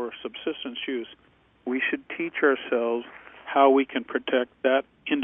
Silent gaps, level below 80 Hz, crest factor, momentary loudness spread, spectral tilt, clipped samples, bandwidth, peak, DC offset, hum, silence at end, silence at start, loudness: none; -70 dBFS; 20 dB; 14 LU; -7.5 dB/octave; under 0.1%; 3.7 kHz; -6 dBFS; under 0.1%; none; 0 s; 0 s; -26 LUFS